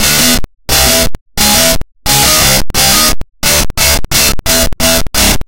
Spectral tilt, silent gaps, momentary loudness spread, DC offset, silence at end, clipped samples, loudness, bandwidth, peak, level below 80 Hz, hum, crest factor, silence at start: -1.5 dB/octave; 1.21-1.26 s; 5 LU; under 0.1%; 0.05 s; 0.2%; -8 LUFS; over 20 kHz; 0 dBFS; -20 dBFS; none; 10 dB; 0 s